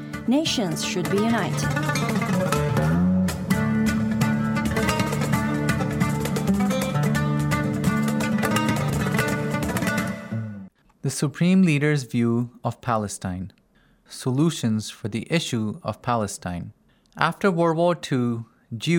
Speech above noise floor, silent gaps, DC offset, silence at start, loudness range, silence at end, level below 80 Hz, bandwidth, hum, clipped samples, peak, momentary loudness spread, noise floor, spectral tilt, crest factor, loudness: 37 dB; none; under 0.1%; 0 s; 4 LU; 0 s; -46 dBFS; 17 kHz; none; under 0.1%; -2 dBFS; 10 LU; -60 dBFS; -5.5 dB/octave; 22 dB; -23 LUFS